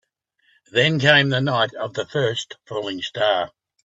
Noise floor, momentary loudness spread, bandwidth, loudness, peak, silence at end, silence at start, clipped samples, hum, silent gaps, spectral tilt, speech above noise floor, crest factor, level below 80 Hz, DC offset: -66 dBFS; 14 LU; 8 kHz; -20 LUFS; 0 dBFS; 0.35 s; 0.75 s; under 0.1%; none; none; -5 dB/octave; 45 dB; 22 dB; -62 dBFS; under 0.1%